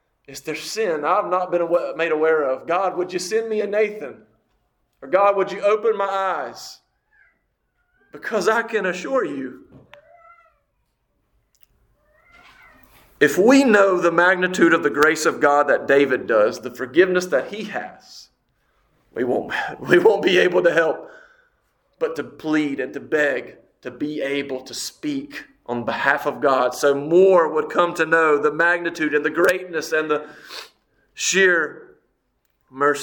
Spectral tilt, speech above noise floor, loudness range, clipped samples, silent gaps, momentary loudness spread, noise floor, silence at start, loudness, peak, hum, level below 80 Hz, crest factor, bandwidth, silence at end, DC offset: -4 dB/octave; 51 dB; 8 LU; under 0.1%; none; 14 LU; -70 dBFS; 0.3 s; -19 LUFS; 0 dBFS; none; -64 dBFS; 20 dB; 19 kHz; 0 s; under 0.1%